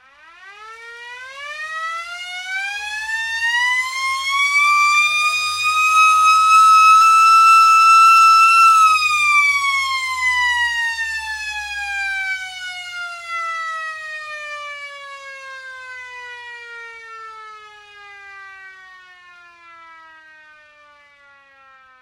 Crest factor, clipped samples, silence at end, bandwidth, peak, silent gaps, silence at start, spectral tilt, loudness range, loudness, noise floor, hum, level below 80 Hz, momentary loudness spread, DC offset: 16 dB; under 0.1%; 3.3 s; 16 kHz; -2 dBFS; none; 0.45 s; 3 dB/octave; 23 LU; -13 LUFS; -49 dBFS; none; -58 dBFS; 24 LU; under 0.1%